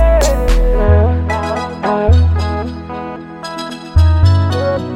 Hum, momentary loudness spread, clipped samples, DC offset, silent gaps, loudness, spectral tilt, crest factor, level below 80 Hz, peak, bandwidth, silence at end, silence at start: none; 13 LU; under 0.1%; under 0.1%; none; -14 LUFS; -6.5 dB/octave; 12 dB; -16 dBFS; 0 dBFS; 12.5 kHz; 0 s; 0 s